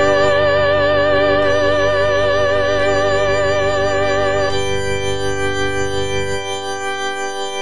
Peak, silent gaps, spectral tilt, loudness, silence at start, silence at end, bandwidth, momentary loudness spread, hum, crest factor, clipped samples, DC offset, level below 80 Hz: -2 dBFS; none; -4 dB/octave; -16 LUFS; 0 s; 0 s; 10 kHz; 8 LU; none; 12 dB; under 0.1%; 6%; -36 dBFS